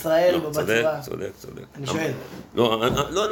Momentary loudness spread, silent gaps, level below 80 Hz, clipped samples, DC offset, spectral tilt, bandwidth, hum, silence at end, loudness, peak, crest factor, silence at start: 15 LU; none; -50 dBFS; under 0.1%; under 0.1%; -4.5 dB/octave; 17 kHz; none; 0 s; -23 LUFS; -6 dBFS; 18 dB; 0 s